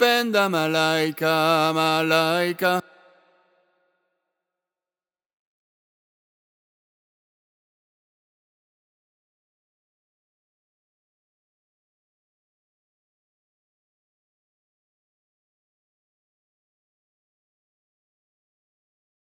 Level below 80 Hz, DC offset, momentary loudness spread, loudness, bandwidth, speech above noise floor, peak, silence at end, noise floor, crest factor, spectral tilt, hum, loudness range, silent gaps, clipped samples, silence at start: -78 dBFS; under 0.1%; 3 LU; -21 LUFS; 19 kHz; over 69 dB; -2 dBFS; 16.55 s; under -90 dBFS; 26 dB; -4 dB/octave; none; 10 LU; none; under 0.1%; 0 s